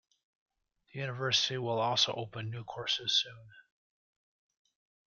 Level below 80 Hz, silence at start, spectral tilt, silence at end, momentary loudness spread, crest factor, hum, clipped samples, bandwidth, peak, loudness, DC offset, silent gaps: -76 dBFS; 0.95 s; -3 dB/octave; 1.45 s; 12 LU; 22 dB; none; under 0.1%; 7.4 kHz; -14 dBFS; -32 LUFS; under 0.1%; none